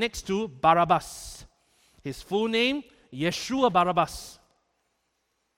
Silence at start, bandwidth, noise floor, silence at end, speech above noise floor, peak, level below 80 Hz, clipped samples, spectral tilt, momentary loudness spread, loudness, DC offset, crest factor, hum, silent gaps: 0 s; 16.5 kHz; -76 dBFS; 1.25 s; 50 dB; -8 dBFS; -54 dBFS; under 0.1%; -4.5 dB/octave; 19 LU; -25 LUFS; under 0.1%; 20 dB; none; none